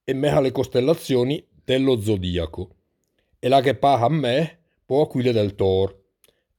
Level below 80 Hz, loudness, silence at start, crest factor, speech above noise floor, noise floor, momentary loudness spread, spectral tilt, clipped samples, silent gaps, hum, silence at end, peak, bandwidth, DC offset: -48 dBFS; -21 LUFS; 0.05 s; 18 dB; 51 dB; -71 dBFS; 10 LU; -6.5 dB/octave; under 0.1%; none; none; 0.65 s; -4 dBFS; 19 kHz; under 0.1%